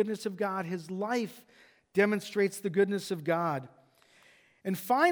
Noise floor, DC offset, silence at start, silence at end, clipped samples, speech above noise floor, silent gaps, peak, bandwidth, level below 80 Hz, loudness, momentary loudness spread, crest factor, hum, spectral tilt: -62 dBFS; under 0.1%; 0 s; 0 s; under 0.1%; 32 dB; none; -12 dBFS; over 20 kHz; -82 dBFS; -31 LUFS; 9 LU; 18 dB; none; -5.5 dB/octave